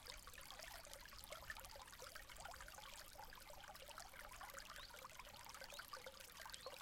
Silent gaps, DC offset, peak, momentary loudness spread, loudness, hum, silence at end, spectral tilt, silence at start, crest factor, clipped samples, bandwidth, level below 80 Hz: none; under 0.1%; -30 dBFS; 3 LU; -56 LUFS; none; 0 s; -1 dB/octave; 0 s; 26 dB; under 0.1%; 16.5 kHz; -68 dBFS